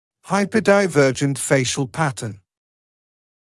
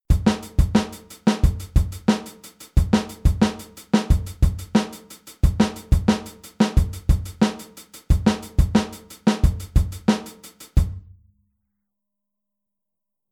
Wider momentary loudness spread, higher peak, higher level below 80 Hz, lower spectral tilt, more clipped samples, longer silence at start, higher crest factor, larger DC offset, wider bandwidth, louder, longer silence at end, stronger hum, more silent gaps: second, 8 LU vs 17 LU; about the same, -4 dBFS vs -4 dBFS; second, -60 dBFS vs -26 dBFS; second, -5 dB/octave vs -6.5 dB/octave; neither; first, 0.25 s vs 0.1 s; about the same, 16 dB vs 18 dB; neither; second, 12 kHz vs 16.5 kHz; first, -19 LUFS vs -22 LUFS; second, 1.1 s vs 2.3 s; neither; neither